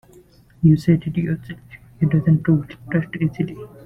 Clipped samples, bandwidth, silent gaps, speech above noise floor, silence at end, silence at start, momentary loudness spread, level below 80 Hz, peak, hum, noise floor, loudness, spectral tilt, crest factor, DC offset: under 0.1%; 5.8 kHz; none; 31 dB; 0.2 s; 0.6 s; 11 LU; -48 dBFS; -4 dBFS; none; -49 dBFS; -20 LUFS; -9.5 dB/octave; 16 dB; under 0.1%